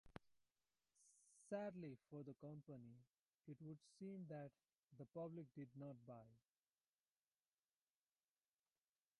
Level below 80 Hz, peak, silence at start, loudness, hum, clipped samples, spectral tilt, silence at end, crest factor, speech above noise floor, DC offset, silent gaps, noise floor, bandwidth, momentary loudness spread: -88 dBFS; -38 dBFS; 0.05 s; -57 LUFS; none; under 0.1%; -7.5 dB/octave; 2.8 s; 22 dB; over 34 dB; under 0.1%; 4.77-4.83 s; under -90 dBFS; 11 kHz; 12 LU